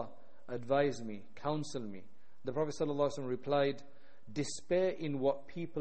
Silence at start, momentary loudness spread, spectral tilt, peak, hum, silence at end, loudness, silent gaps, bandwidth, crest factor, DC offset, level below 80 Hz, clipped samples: 0 s; 13 LU; -5.5 dB/octave; -18 dBFS; none; 0 s; -36 LUFS; none; 8.4 kHz; 18 dB; 0.7%; -68 dBFS; under 0.1%